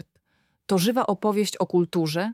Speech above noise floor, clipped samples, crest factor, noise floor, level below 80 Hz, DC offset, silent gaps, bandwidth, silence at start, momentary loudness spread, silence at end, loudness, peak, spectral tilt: 47 dB; under 0.1%; 16 dB; -70 dBFS; -70 dBFS; under 0.1%; none; 16.5 kHz; 0.7 s; 3 LU; 0 s; -24 LUFS; -10 dBFS; -5.5 dB/octave